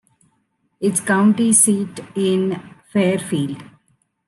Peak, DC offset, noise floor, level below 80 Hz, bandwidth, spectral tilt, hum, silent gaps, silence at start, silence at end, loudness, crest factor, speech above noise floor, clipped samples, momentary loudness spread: -2 dBFS; under 0.1%; -67 dBFS; -66 dBFS; 12.5 kHz; -4.5 dB/octave; none; none; 0.8 s; 0.65 s; -18 LUFS; 18 dB; 49 dB; under 0.1%; 14 LU